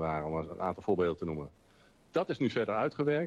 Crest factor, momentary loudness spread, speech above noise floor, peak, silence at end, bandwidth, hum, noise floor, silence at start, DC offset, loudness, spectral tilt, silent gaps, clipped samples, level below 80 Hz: 16 dB; 7 LU; 31 dB; -18 dBFS; 0 s; 9.8 kHz; none; -63 dBFS; 0 s; under 0.1%; -33 LUFS; -7.5 dB/octave; none; under 0.1%; -60 dBFS